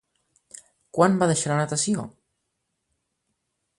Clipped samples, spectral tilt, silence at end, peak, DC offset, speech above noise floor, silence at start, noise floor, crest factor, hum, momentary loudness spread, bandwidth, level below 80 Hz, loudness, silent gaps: under 0.1%; -5 dB/octave; 1.7 s; -4 dBFS; under 0.1%; 56 dB; 0.95 s; -78 dBFS; 22 dB; none; 12 LU; 11.5 kHz; -66 dBFS; -23 LUFS; none